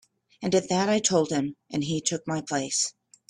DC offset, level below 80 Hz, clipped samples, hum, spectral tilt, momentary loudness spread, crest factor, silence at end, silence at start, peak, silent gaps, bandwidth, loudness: under 0.1%; -64 dBFS; under 0.1%; none; -3.5 dB/octave; 8 LU; 18 dB; 0.4 s; 0.4 s; -8 dBFS; none; 12.5 kHz; -26 LUFS